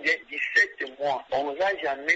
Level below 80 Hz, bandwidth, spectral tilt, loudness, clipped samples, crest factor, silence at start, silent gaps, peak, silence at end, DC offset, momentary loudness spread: -66 dBFS; 8 kHz; -2 dB/octave; -26 LUFS; under 0.1%; 16 dB; 0 s; none; -10 dBFS; 0 s; under 0.1%; 7 LU